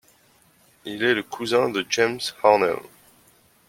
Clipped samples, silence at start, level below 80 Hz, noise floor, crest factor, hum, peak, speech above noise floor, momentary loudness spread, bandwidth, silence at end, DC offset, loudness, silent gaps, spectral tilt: under 0.1%; 0.85 s; -66 dBFS; -59 dBFS; 20 dB; none; -4 dBFS; 37 dB; 13 LU; 16.5 kHz; 0.85 s; under 0.1%; -22 LUFS; none; -3.5 dB/octave